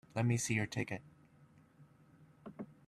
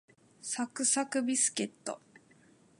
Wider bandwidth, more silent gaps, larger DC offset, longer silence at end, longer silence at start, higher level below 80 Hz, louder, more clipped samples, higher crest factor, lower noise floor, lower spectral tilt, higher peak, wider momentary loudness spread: first, 13.5 kHz vs 11.5 kHz; neither; neither; second, 0.15 s vs 0.8 s; second, 0.15 s vs 0.45 s; first, -70 dBFS vs -86 dBFS; second, -37 LUFS vs -31 LUFS; neither; about the same, 20 dB vs 20 dB; about the same, -65 dBFS vs -63 dBFS; first, -5 dB/octave vs -1.5 dB/octave; second, -20 dBFS vs -16 dBFS; first, 20 LU vs 15 LU